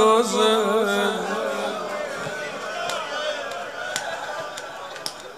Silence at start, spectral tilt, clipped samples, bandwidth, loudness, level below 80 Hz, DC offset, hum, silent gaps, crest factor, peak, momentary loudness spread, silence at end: 0 s; -3 dB/octave; under 0.1%; 15.5 kHz; -25 LUFS; -70 dBFS; 0.1%; none; none; 20 dB; -4 dBFS; 13 LU; 0 s